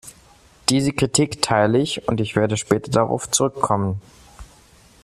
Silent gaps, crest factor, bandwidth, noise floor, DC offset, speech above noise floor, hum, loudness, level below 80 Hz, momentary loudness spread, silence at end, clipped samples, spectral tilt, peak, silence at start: none; 20 dB; 14 kHz; -51 dBFS; under 0.1%; 31 dB; none; -20 LUFS; -50 dBFS; 5 LU; 0.6 s; under 0.1%; -4.5 dB/octave; -2 dBFS; 0.05 s